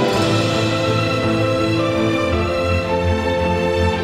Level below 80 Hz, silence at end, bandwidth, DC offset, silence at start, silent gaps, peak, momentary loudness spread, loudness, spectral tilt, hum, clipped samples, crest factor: -34 dBFS; 0 s; 15.5 kHz; under 0.1%; 0 s; none; -6 dBFS; 2 LU; -18 LUFS; -6 dB/octave; none; under 0.1%; 12 dB